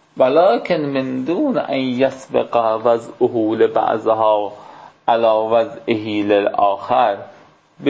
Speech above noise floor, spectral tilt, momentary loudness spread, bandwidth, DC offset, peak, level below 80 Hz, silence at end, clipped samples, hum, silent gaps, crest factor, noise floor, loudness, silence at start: 27 dB; -7 dB/octave; 6 LU; 8 kHz; under 0.1%; -2 dBFS; -62 dBFS; 0 s; under 0.1%; none; none; 14 dB; -44 dBFS; -17 LUFS; 0.15 s